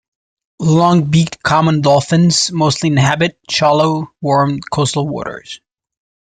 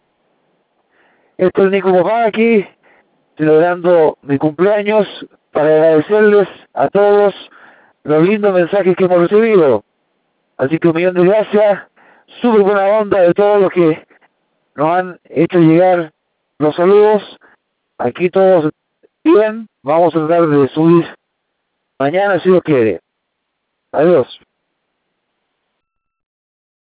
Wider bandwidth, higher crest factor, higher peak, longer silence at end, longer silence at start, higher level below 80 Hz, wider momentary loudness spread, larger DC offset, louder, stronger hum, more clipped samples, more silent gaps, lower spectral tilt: first, 9.4 kHz vs 4 kHz; about the same, 14 dB vs 14 dB; about the same, -2 dBFS vs 0 dBFS; second, 0.75 s vs 2.5 s; second, 0.6 s vs 1.4 s; first, -48 dBFS vs -58 dBFS; about the same, 10 LU vs 10 LU; neither; about the same, -14 LUFS vs -12 LUFS; neither; neither; neither; second, -5 dB/octave vs -11 dB/octave